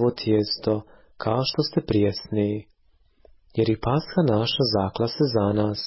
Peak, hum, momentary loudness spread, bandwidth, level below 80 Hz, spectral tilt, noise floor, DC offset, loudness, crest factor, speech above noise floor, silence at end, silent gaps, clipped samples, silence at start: -10 dBFS; none; 5 LU; 6 kHz; -48 dBFS; -9.5 dB/octave; -61 dBFS; under 0.1%; -24 LUFS; 14 dB; 38 dB; 0 s; none; under 0.1%; 0 s